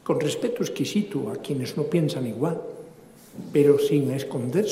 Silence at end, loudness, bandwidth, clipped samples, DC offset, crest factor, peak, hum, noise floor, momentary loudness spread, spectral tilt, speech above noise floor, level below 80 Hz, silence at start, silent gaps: 0 s; -25 LUFS; 16 kHz; under 0.1%; under 0.1%; 18 dB; -6 dBFS; none; -48 dBFS; 14 LU; -6.5 dB/octave; 24 dB; -68 dBFS; 0.05 s; none